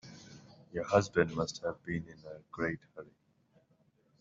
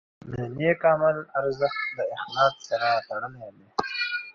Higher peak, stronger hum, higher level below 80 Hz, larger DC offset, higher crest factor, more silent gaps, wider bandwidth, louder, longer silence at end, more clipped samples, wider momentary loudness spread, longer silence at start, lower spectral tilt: second, -12 dBFS vs -6 dBFS; neither; about the same, -64 dBFS vs -60 dBFS; neither; about the same, 24 dB vs 20 dB; neither; about the same, 7.8 kHz vs 7.2 kHz; second, -34 LUFS vs -26 LUFS; first, 1.15 s vs 0.05 s; neither; first, 23 LU vs 13 LU; second, 0.05 s vs 0.25 s; about the same, -5 dB/octave vs -5.5 dB/octave